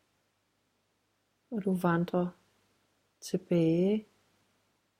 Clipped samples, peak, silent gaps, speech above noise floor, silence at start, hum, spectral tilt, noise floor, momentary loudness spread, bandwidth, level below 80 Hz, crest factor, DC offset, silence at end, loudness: under 0.1%; -14 dBFS; none; 47 dB; 1.5 s; none; -7.5 dB/octave; -76 dBFS; 11 LU; 15.5 kHz; -72 dBFS; 20 dB; under 0.1%; 0.95 s; -31 LUFS